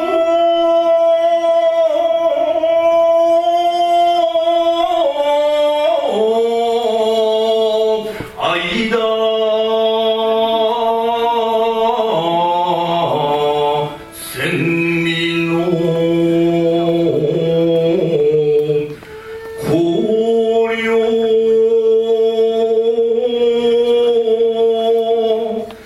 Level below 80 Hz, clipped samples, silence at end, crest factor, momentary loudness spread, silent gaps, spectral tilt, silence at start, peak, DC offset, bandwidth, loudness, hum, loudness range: -52 dBFS; under 0.1%; 0 s; 12 dB; 4 LU; none; -6 dB/octave; 0 s; -4 dBFS; under 0.1%; 13 kHz; -14 LUFS; none; 3 LU